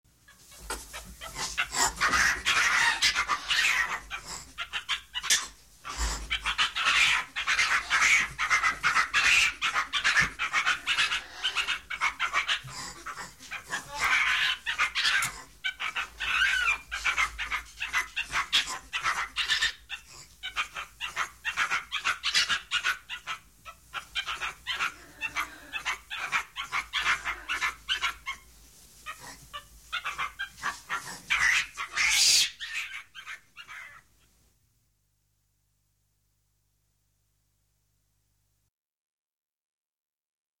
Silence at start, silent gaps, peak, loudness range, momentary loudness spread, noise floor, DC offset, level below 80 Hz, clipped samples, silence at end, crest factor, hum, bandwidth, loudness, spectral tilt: 0.3 s; none; -10 dBFS; 9 LU; 17 LU; -74 dBFS; under 0.1%; -52 dBFS; under 0.1%; 6.6 s; 20 dB; 50 Hz at -65 dBFS; 17 kHz; -27 LUFS; 1 dB/octave